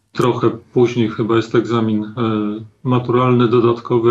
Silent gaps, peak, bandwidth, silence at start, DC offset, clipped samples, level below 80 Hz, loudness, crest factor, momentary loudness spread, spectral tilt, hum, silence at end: none; -2 dBFS; 8 kHz; 0.15 s; under 0.1%; under 0.1%; -60 dBFS; -17 LUFS; 12 dB; 6 LU; -8 dB/octave; none; 0 s